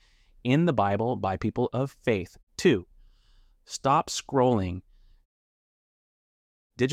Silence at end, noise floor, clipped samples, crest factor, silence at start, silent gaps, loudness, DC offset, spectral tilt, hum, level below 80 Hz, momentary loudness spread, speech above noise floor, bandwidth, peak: 0 s; -59 dBFS; under 0.1%; 20 dB; 0.45 s; 2.43-2.47 s, 5.25-6.70 s; -27 LUFS; under 0.1%; -6 dB/octave; none; -56 dBFS; 11 LU; 34 dB; 15 kHz; -8 dBFS